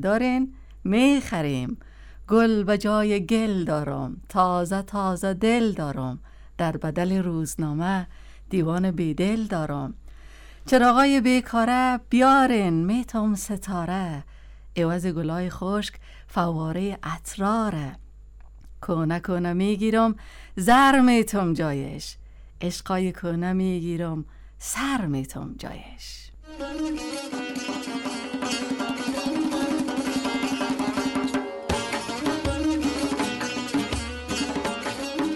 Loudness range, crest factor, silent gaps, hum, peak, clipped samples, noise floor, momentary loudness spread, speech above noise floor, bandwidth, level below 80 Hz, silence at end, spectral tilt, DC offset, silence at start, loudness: 8 LU; 18 dB; none; none; -6 dBFS; under 0.1%; -45 dBFS; 14 LU; 22 dB; 18 kHz; -44 dBFS; 0 s; -5.5 dB/octave; under 0.1%; 0 s; -24 LUFS